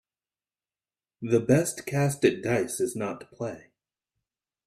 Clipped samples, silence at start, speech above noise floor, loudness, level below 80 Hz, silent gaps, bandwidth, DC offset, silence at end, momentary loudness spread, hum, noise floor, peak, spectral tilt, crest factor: under 0.1%; 1.2 s; over 64 dB; -27 LUFS; -64 dBFS; none; 15.5 kHz; under 0.1%; 1.05 s; 13 LU; none; under -90 dBFS; -8 dBFS; -5.5 dB/octave; 20 dB